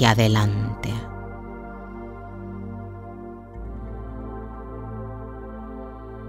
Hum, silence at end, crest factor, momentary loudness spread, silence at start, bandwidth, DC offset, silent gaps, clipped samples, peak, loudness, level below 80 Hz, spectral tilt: none; 0 s; 26 dB; 16 LU; 0 s; 15 kHz; under 0.1%; none; under 0.1%; -2 dBFS; -29 LUFS; -40 dBFS; -6 dB/octave